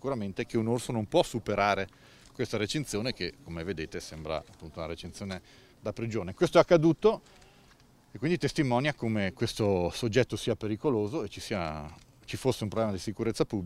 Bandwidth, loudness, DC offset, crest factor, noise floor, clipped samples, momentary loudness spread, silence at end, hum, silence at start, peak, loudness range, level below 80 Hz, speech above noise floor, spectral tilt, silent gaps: 15.5 kHz; -30 LUFS; under 0.1%; 24 dB; -59 dBFS; under 0.1%; 14 LU; 0 s; none; 0.05 s; -8 dBFS; 8 LU; -54 dBFS; 30 dB; -5.5 dB/octave; none